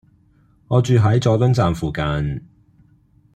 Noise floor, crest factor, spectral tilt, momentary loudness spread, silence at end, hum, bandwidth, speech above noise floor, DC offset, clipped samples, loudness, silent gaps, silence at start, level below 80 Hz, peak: -55 dBFS; 16 dB; -7.5 dB/octave; 9 LU; 0.95 s; none; 9.2 kHz; 39 dB; under 0.1%; under 0.1%; -18 LUFS; none; 0.7 s; -40 dBFS; -4 dBFS